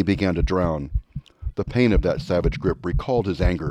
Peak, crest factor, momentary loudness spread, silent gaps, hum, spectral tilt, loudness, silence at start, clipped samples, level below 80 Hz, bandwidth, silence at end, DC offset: -6 dBFS; 16 dB; 11 LU; none; none; -8 dB/octave; -23 LUFS; 0 s; under 0.1%; -28 dBFS; 9.2 kHz; 0 s; under 0.1%